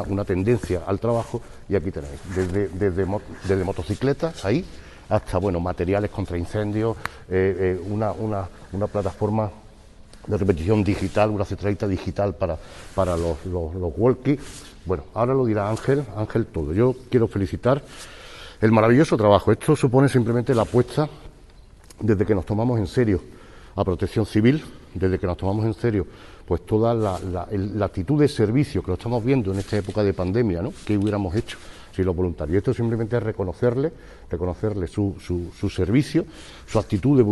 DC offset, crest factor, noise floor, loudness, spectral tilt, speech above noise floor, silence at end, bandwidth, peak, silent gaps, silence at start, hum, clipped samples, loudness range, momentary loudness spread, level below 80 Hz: under 0.1%; 20 dB; -47 dBFS; -23 LUFS; -7.5 dB/octave; 25 dB; 0 s; 12 kHz; -2 dBFS; none; 0 s; none; under 0.1%; 6 LU; 9 LU; -42 dBFS